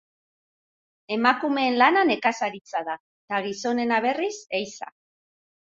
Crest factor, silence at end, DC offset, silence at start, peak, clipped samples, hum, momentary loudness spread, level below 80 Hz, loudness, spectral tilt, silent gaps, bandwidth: 22 dB; 0.9 s; under 0.1%; 1.1 s; -4 dBFS; under 0.1%; none; 15 LU; -74 dBFS; -24 LUFS; -3.5 dB/octave; 2.61-2.65 s, 3.00-3.28 s; 7.8 kHz